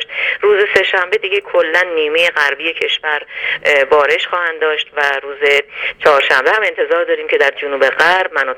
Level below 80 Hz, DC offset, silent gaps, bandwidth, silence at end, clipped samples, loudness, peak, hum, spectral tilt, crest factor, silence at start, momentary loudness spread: -56 dBFS; under 0.1%; none; 15.5 kHz; 0 s; under 0.1%; -13 LUFS; 0 dBFS; none; -2 dB/octave; 14 dB; 0 s; 6 LU